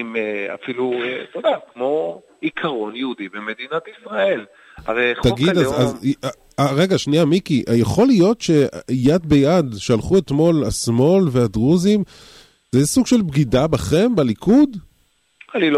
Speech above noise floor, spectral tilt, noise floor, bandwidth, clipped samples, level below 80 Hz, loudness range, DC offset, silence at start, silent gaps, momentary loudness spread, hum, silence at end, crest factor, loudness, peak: 44 dB; -6 dB/octave; -61 dBFS; 15.5 kHz; under 0.1%; -42 dBFS; 7 LU; under 0.1%; 0 s; none; 11 LU; none; 0 s; 12 dB; -18 LUFS; -6 dBFS